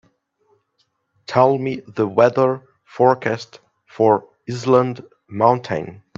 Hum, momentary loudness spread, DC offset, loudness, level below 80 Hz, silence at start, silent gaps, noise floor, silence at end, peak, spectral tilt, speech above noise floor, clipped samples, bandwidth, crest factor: none; 16 LU; under 0.1%; -18 LUFS; -64 dBFS; 1.3 s; none; -68 dBFS; 0.25 s; 0 dBFS; -7 dB/octave; 50 dB; under 0.1%; 7.6 kHz; 20 dB